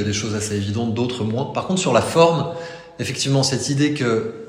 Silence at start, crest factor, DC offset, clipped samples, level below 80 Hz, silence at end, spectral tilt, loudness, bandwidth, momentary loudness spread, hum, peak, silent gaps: 0 s; 20 dB; under 0.1%; under 0.1%; -54 dBFS; 0 s; -5 dB/octave; -20 LUFS; 16 kHz; 11 LU; none; 0 dBFS; none